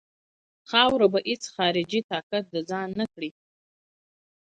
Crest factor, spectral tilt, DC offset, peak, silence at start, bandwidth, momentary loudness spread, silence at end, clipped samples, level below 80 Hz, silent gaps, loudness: 24 dB; -4 dB/octave; under 0.1%; -4 dBFS; 0.7 s; 9.4 kHz; 11 LU; 1.2 s; under 0.1%; -66 dBFS; 2.04-2.09 s, 2.23-2.30 s; -25 LUFS